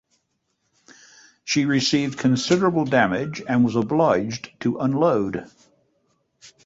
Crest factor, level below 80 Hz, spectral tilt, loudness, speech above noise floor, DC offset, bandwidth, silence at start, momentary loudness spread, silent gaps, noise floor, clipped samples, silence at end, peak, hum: 20 dB; -58 dBFS; -5.5 dB/octave; -21 LUFS; 52 dB; under 0.1%; 8 kHz; 1.45 s; 8 LU; none; -73 dBFS; under 0.1%; 0.15 s; -4 dBFS; none